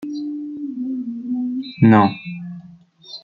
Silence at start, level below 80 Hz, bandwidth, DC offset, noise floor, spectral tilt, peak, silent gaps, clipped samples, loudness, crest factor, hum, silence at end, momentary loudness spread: 0 s; -56 dBFS; 6 kHz; under 0.1%; -45 dBFS; -9 dB/octave; -2 dBFS; none; under 0.1%; -19 LUFS; 18 dB; none; 0.05 s; 21 LU